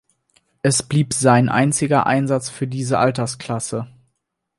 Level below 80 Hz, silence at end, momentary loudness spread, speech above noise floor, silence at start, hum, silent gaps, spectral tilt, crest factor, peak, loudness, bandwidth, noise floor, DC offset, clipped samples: -54 dBFS; 0.7 s; 11 LU; 57 dB; 0.65 s; none; none; -5 dB/octave; 18 dB; -2 dBFS; -19 LUFS; 11.5 kHz; -75 dBFS; under 0.1%; under 0.1%